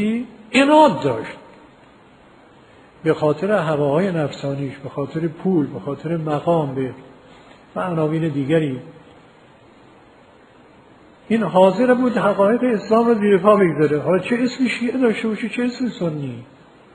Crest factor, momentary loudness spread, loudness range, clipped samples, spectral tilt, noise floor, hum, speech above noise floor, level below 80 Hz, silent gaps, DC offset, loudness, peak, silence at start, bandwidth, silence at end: 20 dB; 13 LU; 9 LU; under 0.1%; -7 dB/octave; -48 dBFS; none; 30 dB; -60 dBFS; none; under 0.1%; -19 LUFS; 0 dBFS; 0 s; 11 kHz; 0.5 s